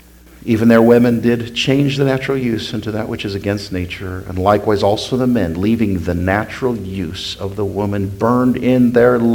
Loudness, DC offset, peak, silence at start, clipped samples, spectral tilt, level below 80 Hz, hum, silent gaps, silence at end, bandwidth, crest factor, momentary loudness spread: -16 LUFS; under 0.1%; 0 dBFS; 0.4 s; under 0.1%; -6.5 dB/octave; -42 dBFS; none; none; 0 s; 18 kHz; 16 dB; 12 LU